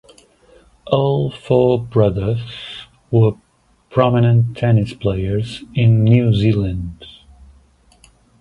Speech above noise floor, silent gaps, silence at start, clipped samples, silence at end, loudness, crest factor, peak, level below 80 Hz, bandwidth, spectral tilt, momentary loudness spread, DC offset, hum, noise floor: 38 dB; none; 0.85 s; under 0.1%; 1.3 s; -17 LUFS; 16 dB; 0 dBFS; -40 dBFS; 5.4 kHz; -9 dB/octave; 16 LU; under 0.1%; none; -53 dBFS